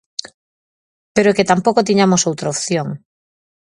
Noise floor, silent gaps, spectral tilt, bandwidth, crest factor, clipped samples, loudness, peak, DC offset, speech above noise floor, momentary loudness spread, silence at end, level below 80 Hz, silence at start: under -90 dBFS; none; -4.5 dB/octave; 11 kHz; 18 dB; under 0.1%; -15 LUFS; 0 dBFS; under 0.1%; over 75 dB; 15 LU; 0.7 s; -56 dBFS; 1.15 s